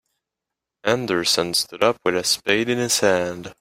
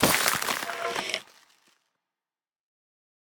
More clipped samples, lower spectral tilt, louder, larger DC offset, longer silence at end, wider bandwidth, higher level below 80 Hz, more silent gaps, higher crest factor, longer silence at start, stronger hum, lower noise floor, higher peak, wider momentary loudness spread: neither; about the same, -2.5 dB/octave vs -1.5 dB/octave; first, -20 LUFS vs -27 LUFS; neither; second, 0.1 s vs 2.2 s; second, 16 kHz vs over 20 kHz; about the same, -60 dBFS vs -60 dBFS; neither; second, 20 dB vs 28 dB; first, 0.85 s vs 0 s; neither; second, -85 dBFS vs under -90 dBFS; about the same, -2 dBFS vs -4 dBFS; second, 5 LU vs 10 LU